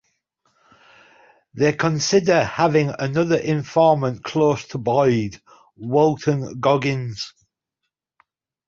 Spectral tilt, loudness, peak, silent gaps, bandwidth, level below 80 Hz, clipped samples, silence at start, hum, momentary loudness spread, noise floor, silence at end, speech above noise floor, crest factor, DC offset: -5.5 dB/octave; -20 LUFS; -4 dBFS; none; 7.6 kHz; -56 dBFS; under 0.1%; 1.55 s; none; 8 LU; -81 dBFS; 1.4 s; 61 dB; 18 dB; under 0.1%